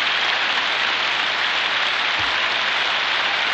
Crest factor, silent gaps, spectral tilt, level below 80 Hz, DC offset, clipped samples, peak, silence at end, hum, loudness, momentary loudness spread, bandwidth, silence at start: 14 dB; none; -0.5 dB/octave; -60 dBFS; under 0.1%; under 0.1%; -6 dBFS; 0 s; none; -18 LUFS; 1 LU; 8.8 kHz; 0 s